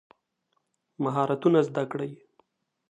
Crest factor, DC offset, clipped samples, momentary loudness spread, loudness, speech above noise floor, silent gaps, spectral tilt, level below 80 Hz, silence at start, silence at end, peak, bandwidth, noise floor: 20 dB; under 0.1%; under 0.1%; 12 LU; -27 LUFS; 51 dB; none; -8 dB/octave; -78 dBFS; 1 s; 0.75 s; -8 dBFS; 9.8 kHz; -76 dBFS